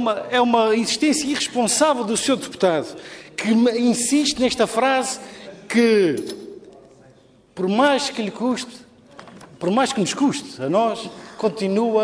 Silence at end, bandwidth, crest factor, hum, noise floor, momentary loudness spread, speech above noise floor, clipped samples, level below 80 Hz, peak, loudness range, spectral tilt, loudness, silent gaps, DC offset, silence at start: 0 s; 11 kHz; 16 dB; none; -52 dBFS; 15 LU; 32 dB; under 0.1%; -60 dBFS; -4 dBFS; 4 LU; -3.5 dB/octave; -20 LUFS; none; under 0.1%; 0 s